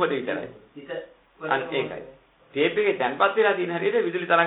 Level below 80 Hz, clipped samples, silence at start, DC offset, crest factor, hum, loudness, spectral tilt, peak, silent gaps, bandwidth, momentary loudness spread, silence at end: -68 dBFS; under 0.1%; 0 s; under 0.1%; 22 dB; none; -24 LUFS; -9.5 dB/octave; -4 dBFS; none; 4.1 kHz; 15 LU; 0 s